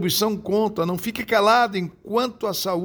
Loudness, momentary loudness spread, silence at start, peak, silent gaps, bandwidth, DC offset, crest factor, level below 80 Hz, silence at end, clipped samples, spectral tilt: -22 LUFS; 8 LU; 0 s; -6 dBFS; none; over 20 kHz; under 0.1%; 16 dB; -56 dBFS; 0 s; under 0.1%; -4 dB/octave